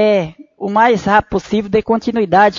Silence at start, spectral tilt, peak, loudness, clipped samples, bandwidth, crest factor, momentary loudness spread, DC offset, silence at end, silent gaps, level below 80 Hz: 0 s; -6 dB/octave; 0 dBFS; -14 LUFS; under 0.1%; 7.6 kHz; 14 dB; 7 LU; under 0.1%; 0 s; none; -42 dBFS